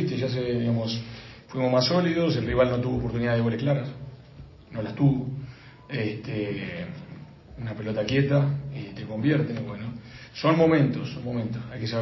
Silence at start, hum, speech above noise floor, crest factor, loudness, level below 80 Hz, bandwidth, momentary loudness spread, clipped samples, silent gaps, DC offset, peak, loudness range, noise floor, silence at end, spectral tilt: 0 s; none; 21 dB; 18 dB; -26 LUFS; -50 dBFS; 6 kHz; 18 LU; under 0.1%; none; under 0.1%; -8 dBFS; 5 LU; -47 dBFS; 0 s; -7.5 dB/octave